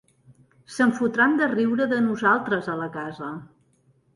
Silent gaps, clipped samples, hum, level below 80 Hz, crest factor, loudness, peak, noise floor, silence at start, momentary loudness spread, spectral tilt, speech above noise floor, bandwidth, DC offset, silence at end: none; under 0.1%; none; -66 dBFS; 18 dB; -23 LUFS; -8 dBFS; -63 dBFS; 0.7 s; 15 LU; -6 dB/octave; 40 dB; 11.5 kHz; under 0.1%; 0.7 s